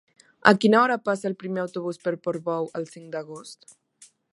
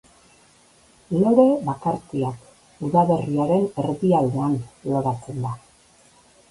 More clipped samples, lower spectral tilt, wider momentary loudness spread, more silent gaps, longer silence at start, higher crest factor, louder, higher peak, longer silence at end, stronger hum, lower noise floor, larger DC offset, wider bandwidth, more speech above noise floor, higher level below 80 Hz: neither; second, -5.5 dB/octave vs -9 dB/octave; first, 17 LU vs 13 LU; neither; second, 0.45 s vs 1.1 s; about the same, 24 dB vs 20 dB; about the same, -24 LUFS vs -22 LUFS; about the same, 0 dBFS vs -2 dBFS; second, 0.8 s vs 0.95 s; neither; about the same, -56 dBFS vs -55 dBFS; neither; about the same, 11.5 kHz vs 11.5 kHz; about the same, 32 dB vs 34 dB; second, -72 dBFS vs -56 dBFS